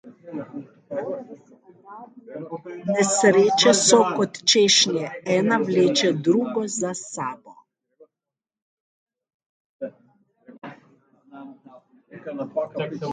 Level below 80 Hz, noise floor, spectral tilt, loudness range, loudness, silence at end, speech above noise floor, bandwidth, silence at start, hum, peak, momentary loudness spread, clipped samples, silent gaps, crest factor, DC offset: -72 dBFS; -89 dBFS; -3 dB/octave; 18 LU; -20 LUFS; 0 s; 68 dB; 9.6 kHz; 0.05 s; none; -2 dBFS; 24 LU; under 0.1%; 8.62-9.06 s, 9.34-9.40 s, 9.46-9.79 s; 22 dB; under 0.1%